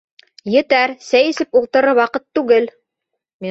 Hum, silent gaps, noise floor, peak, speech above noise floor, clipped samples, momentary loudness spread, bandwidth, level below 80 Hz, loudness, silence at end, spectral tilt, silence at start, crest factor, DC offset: none; 3.34-3.39 s; -78 dBFS; -2 dBFS; 63 dB; under 0.1%; 10 LU; 7.8 kHz; -62 dBFS; -15 LUFS; 0 s; -4.5 dB/octave; 0.45 s; 14 dB; under 0.1%